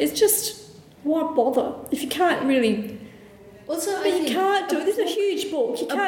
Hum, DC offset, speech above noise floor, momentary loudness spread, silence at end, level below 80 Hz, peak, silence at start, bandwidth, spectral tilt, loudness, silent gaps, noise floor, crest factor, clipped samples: none; under 0.1%; 24 dB; 11 LU; 0 s; -62 dBFS; -6 dBFS; 0 s; 19 kHz; -3 dB/octave; -23 LUFS; none; -46 dBFS; 16 dB; under 0.1%